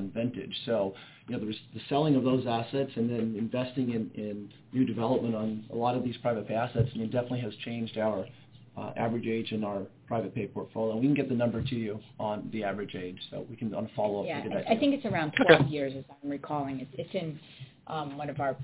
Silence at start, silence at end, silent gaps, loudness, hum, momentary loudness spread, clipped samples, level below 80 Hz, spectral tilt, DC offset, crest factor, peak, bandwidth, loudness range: 0 s; 0 s; none; -31 LUFS; none; 12 LU; under 0.1%; -60 dBFS; -5.5 dB/octave; under 0.1%; 26 dB; -4 dBFS; 4 kHz; 6 LU